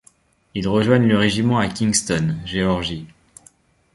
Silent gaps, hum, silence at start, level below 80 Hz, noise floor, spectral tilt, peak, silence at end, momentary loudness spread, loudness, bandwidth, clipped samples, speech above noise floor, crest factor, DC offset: none; none; 0.55 s; -44 dBFS; -56 dBFS; -5 dB/octave; -2 dBFS; 0.9 s; 11 LU; -19 LUFS; 11.5 kHz; under 0.1%; 38 dB; 18 dB; under 0.1%